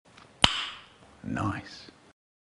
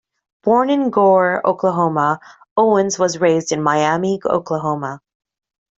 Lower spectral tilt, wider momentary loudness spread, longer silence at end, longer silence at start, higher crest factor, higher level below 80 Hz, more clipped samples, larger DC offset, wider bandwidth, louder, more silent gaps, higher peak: second, -3 dB/octave vs -5 dB/octave; first, 22 LU vs 10 LU; second, 0.5 s vs 0.8 s; about the same, 0.4 s vs 0.45 s; first, 32 dB vs 14 dB; first, -52 dBFS vs -62 dBFS; neither; neither; first, 10.5 kHz vs 8 kHz; second, -28 LUFS vs -17 LUFS; second, none vs 2.51-2.56 s; about the same, -2 dBFS vs -2 dBFS